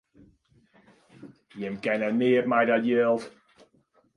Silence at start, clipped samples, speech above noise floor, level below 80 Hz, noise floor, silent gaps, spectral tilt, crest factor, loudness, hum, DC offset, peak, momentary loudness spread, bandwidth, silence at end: 1.2 s; under 0.1%; 41 dB; -72 dBFS; -66 dBFS; none; -7 dB/octave; 18 dB; -25 LUFS; none; under 0.1%; -10 dBFS; 15 LU; 10.5 kHz; 0.85 s